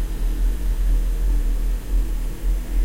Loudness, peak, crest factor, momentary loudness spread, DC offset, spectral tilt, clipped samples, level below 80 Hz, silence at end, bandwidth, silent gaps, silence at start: -26 LUFS; -10 dBFS; 10 dB; 4 LU; under 0.1%; -6 dB/octave; under 0.1%; -20 dBFS; 0 s; 16 kHz; none; 0 s